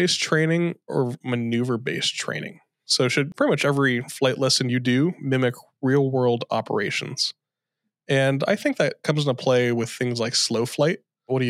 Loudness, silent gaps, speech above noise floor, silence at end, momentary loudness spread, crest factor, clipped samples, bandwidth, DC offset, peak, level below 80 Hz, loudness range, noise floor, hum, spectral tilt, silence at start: -23 LUFS; none; 59 dB; 0 s; 6 LU; 18 dB; under 0.1%; 15 kHz; under 0.1%; -6 dBFS; -78 dBFS; 2 LU; -82 dBFS; none; -4.5 dB/octave; 0 s